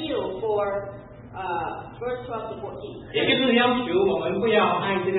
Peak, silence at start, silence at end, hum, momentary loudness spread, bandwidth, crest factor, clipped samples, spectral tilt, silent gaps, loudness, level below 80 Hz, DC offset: -8 dBFS; 0 s; 0 s; none; 16 LU; 4.1 kHz; 18 dB; under 0.1%; -9.5 dB/octave; none; -24 LUFS; -54 dBFS; under 0.1%